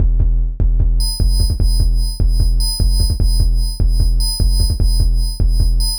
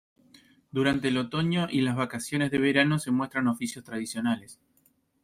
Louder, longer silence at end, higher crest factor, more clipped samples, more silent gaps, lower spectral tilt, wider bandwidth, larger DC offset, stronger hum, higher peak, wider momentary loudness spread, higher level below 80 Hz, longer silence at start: first, -17 LUFS vs -27 LUFS; second, 0 s vs 0.7 s; second, 10 dB vs 20 dB; neither; neither; about the same, -5 dB/octave vs -5.5 dB/octave; about the same, 16 kHz vs 15.5 kHz; neither; neither; first, -2 dBFS vs -10 dBFS; second, 2 LU vs 10 LU; first, -14 dBFS vs -62 dBFS; second, 0 s vs 0.75 s